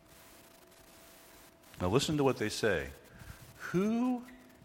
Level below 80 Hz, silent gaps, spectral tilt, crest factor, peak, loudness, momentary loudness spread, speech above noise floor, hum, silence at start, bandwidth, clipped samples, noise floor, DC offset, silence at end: -60 dBFS; none; -5 dB/octave; 22 dB; -12 dBFS; -32 LUFS; 24 LU; 27 dB; none; 1.35 s; 16.5 kHz; under 0.1%; -58 dBFS; under 0.1%; 0.3 s